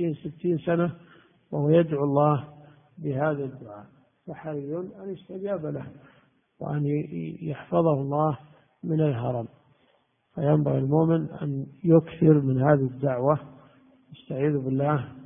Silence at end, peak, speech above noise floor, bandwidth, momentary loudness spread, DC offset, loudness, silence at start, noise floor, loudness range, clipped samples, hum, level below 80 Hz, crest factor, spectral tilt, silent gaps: 0 s; -6 dBFS; 42 dB; 3.7 kHz; 16 LU; under 0.1%; -26 LUFS; 0 s; -67 dBFS; 10 LU; under 0.1%; none; -62 dBFS; 20 dB; -13 dB/octave; none